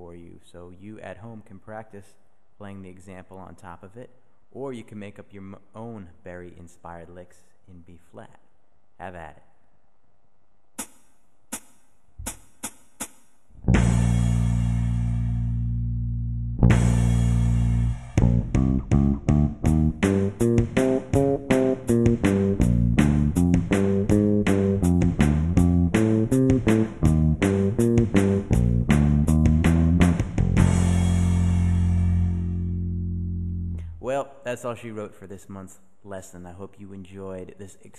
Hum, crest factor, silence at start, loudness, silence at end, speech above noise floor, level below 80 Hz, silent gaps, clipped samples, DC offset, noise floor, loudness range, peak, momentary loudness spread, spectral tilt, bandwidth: none; 18 dB; 0 s; -22 LUFS; 0.3 s; 29 dB; -32 dBFS; none; under 0.1%; 0.4%; -69 dBFS; 22 LU; -6 dBFS; 22 LU; -7.5 dB/octave; 12.5 kHz